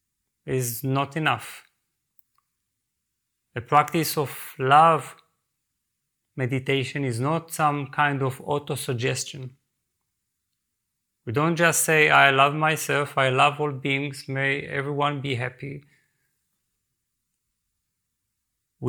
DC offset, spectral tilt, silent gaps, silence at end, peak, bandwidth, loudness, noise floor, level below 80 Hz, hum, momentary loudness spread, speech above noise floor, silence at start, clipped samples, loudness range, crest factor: under 0.1%; -4 dB/octave; none; 0 s; -2 dBFS; over 20 kHz; -23 LUFS; -80 dBFS; -68 dBFS; none; 18 LU; 57 dB; 0.45 s; under 0.1%; 10 LU; 24 dB